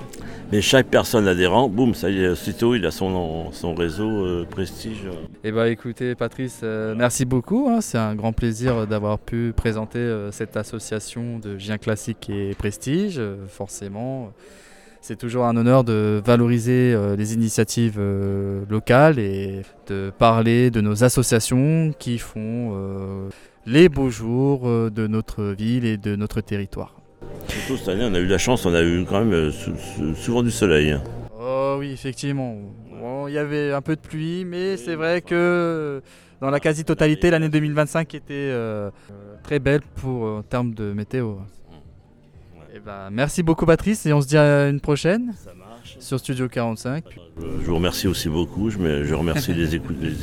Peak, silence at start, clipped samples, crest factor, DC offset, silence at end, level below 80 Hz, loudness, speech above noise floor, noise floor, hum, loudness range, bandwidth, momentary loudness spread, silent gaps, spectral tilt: -2 dBFS; 0 s; under 0.1%; 20 dB; under 0.1%; 0 s; -40 dBFS; -21 LUFS; 27 dB; -48 dBFS; none; 7 LU; 17.5 kHz; 14 LU; none; -6 dB/octave